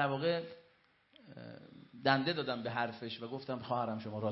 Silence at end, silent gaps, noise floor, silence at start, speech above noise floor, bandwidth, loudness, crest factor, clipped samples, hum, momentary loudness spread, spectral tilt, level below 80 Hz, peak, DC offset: 0 s; none; -69 dBFS; 0 s; 33 dB; 5.8 kHz; -36 LUFS; 24 dB; under 0.1%; none; 21 LU; -3.5 dB/octave; -78 dBFS; -14 dBFS; under 0.1%